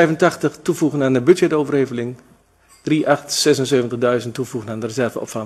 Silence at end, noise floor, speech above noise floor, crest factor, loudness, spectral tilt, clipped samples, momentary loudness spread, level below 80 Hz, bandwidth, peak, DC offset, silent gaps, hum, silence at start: 0 s; -53 dBFS; 35 dB; 18 dB; -18 LUFS; -5 dB/octave; under 0.1%; 11 LU; -60 dBFS; 13.5 kHz; 0 dBFS; under 0.1%; none; none; 0 s